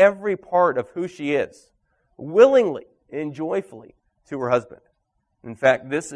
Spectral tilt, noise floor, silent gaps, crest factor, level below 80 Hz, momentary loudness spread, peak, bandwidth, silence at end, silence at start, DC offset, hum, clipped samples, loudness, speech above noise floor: -5.5 dB/octave; -72 dBFS; none; 20 dB; -64 dBFS; 19 LU; -2 dBFS; 10.5 kHz; 0 s; 0 s; under 0.1%; none; under 0.1%; -21 LUFS; 52 dB